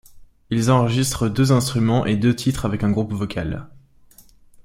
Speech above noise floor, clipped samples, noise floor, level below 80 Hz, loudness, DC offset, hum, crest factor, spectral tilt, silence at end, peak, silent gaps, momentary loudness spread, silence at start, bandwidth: 31 dB; under 0.1%; -50 dBFS; -42 dBFS; -20 LUFS; under 0.1%; none; 18 dB; -6 dB/octave; 0.05 s; -2 dBFS; none; 9 LU; 0.15 s; 16 kHz